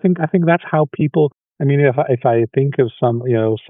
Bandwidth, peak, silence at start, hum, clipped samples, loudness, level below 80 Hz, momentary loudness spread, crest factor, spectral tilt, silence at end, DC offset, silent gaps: 3.8 kHz; -2 dBFS; 0.05 s; none; under 0.1%; -16 LUFS; -66 dBFS; 4 LU; 14 dB; -12.5 dB/octave; 0.1 s; under 0.1%; none